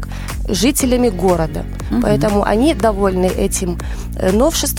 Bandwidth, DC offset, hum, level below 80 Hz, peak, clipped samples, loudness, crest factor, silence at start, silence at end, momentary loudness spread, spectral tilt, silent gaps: 17.5 kHz; under 0.1%; none; -24 dBFS; -2 dBFS; under 0.1%; -16 LUFS; 14 dB; 0 s; 0 s; 10 LU; -5 dB/octave; none